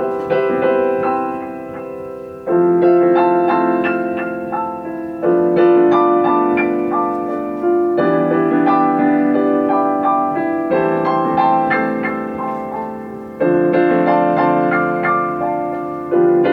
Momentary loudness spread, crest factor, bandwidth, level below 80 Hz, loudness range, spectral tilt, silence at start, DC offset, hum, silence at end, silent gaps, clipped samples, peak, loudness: 11 LU; 14 dB; 4.8 kHz; -56 dBFS; 2 LU; -9 dB/octave; 0 s; under 0.1%; none; 0 s; none; under 0.1%; -2 dBFS; -16 LUFS